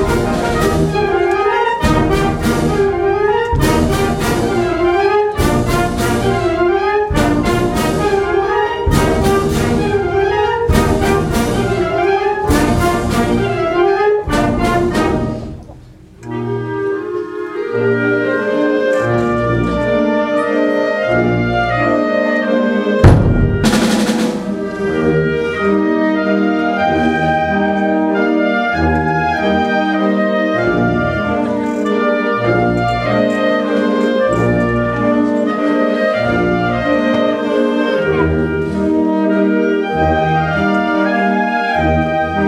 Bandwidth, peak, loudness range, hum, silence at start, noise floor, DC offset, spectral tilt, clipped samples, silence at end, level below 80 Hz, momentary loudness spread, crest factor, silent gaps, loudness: 17 kHz; 0 dBFS; 2 LU; none; 0 s; -38 dBFS; under 0.1%; -6.5 dB/octave; under 0.1%; 0 s; -28 dBFS; 3 LU; 14 dB; none; -14 LUFS